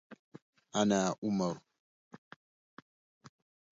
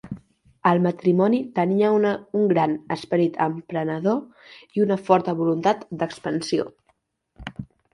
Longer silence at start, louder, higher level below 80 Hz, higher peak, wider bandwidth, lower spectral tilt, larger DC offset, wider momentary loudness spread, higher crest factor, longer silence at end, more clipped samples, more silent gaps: about the same, 0.1 s vs 0.05 s; second, -33 LUFS vs -22 LUFS; second, -74 dBFS vs -58 dBFS; second, -16 dBFS vs -2 dBFS; second, 7.6 kHz vs 11.5 kHz; second, -5.5 dB/octave vs -7 dB/octave; neither; first, 26 LU vs 16 LU; about the same, 20 dB vs 20 dB; first, 0.5 s vs 0.3 s; neither; first, 0.19-0.32 s, 0.42-0.53 s, 1.18-1.22 s, 1.79-2.11 s, 2.18-3.21 s vs none